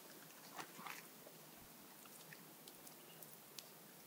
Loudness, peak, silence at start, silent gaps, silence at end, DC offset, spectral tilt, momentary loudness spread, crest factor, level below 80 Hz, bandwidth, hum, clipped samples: -56 LUFS; -26 dBFS; 0 s; none; 0 s; under 0.1%; -2 dB/octave; 6 LU; 32 dB; -90 dBFS; 17.5 kHz; none; under 0.1%